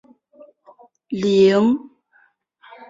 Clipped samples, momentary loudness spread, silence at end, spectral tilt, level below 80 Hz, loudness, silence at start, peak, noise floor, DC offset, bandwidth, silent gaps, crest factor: under 0.1%; 12 LU; 1.05 s; -6.5 dB/octave; -64 dBFS; -17 LUFS; 1.1 s; -4 dBFS; -59 dBFS; under 0.1%; 7.8 kHz; none; 16 dB